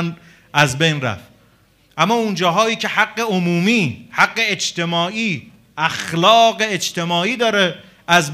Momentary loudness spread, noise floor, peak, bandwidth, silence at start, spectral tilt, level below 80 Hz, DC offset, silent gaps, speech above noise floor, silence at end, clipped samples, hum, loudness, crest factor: 9 LU; -54 dBFS; 0 dBFS; 15.5 kHz; 0 s; -4 dB/octave; -58 dBFS; under 0.1%; none; 37 dB; 0 s; under 0.1%; none; -17 LUFS; 18 dB